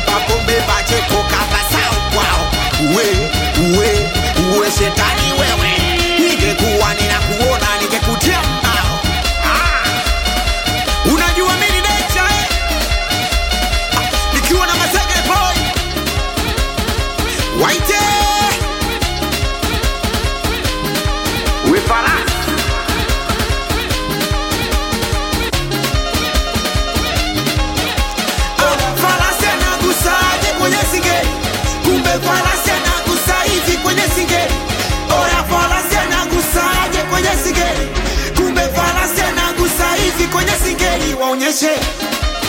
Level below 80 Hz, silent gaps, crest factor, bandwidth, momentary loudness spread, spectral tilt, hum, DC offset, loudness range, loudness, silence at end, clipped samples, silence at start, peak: -22 dBFS; none; 14 dB; 17 kHz; 5 LU; -3.5 dB/octave; none; under 0.1%; 3 LU; -14 LUFS; 0 s; under 0.1%; 0 s; 0 dBFS